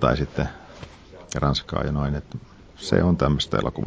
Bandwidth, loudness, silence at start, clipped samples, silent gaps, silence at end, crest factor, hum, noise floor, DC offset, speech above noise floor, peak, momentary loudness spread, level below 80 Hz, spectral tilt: 8 kHz; -24 LUFS; 0 s; under 0.1%; none; 0 s; 20 dB; none; -43 dBFS; under 0.1%; 20 dB; -4 dBFS; 20 LU; -36 dBFS; -6 dB/octave